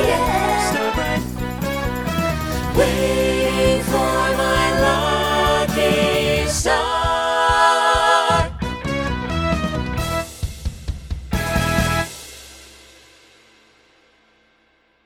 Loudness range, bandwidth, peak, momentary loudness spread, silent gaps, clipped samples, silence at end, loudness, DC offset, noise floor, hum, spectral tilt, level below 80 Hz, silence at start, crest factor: 8 LU; over 20 kHz; -2 dBFS; 13 LU; none; under 0.1%; 2.35 s; -19 LUFS; under 0.1%; -60 dBFS; none; -4.5 dB/octave; -30 dBFS; 0 s; 16 dB